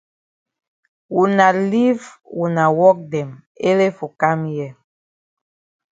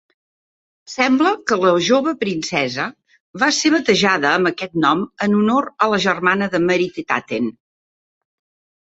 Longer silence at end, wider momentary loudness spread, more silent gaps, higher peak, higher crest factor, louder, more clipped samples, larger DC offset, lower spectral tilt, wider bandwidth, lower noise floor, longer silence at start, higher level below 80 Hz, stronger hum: about the same, 1.2 s vs 1.3 s; first, 13 LU vs 7 LU; about the same, 3.46-3.55 s vs 3.20-3.34 s; about the same, 0 dBFS vs -2 dBFS; about the same, 18 dB vs 18 dB; about the same, -17 LUFS vs -17 LUFS; neither; neither; first, -7 dB/octave vs -4 dB/octave; about the same, 7.8 kHz vs 8 kHz; about the same, under -90 dBFS vs under -90 dBFS; first, 1.1 s vs 0.9 s; second, -66 dBFS vs -60 dBFS; neither